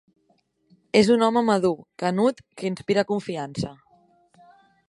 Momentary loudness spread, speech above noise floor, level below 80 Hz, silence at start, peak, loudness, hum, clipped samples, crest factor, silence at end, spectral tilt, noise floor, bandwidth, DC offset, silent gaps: 13 LU; 45 dB; -60 dBFS; 0.95 s; -2 dBFS; -23 LUFS; none; under 0.1%; 22 dB; 1.15 s; -6 dB/octave; -67 dBFS; 11.5 kHz; under 0.1%; none